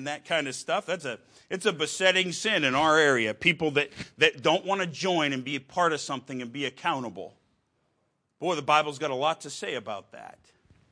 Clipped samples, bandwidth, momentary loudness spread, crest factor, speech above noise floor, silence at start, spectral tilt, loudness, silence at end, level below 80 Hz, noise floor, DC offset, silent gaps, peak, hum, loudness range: under 0.1%; 10.5 kHz; 15 LU; 22 dB; 47 dB; 0 s; -3.5 dB/octave; -26 LUFS; 0.65 s; -68 dBFS; -75 dBFS; under 0.1%; none; -6 dBFS; none; 7 LU